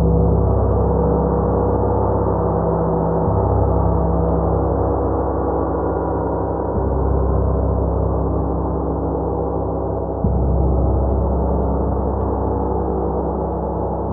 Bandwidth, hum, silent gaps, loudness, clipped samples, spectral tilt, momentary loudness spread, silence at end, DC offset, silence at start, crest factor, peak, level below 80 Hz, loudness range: 1.9 kHz; none; none; -19 LUFS; under 0.1%; -15.5 dB/octave; 4 LU; 0 s; under 0.1%; 0 s; 14 dB; -4 dBFS; -22 dBFS; 2 LU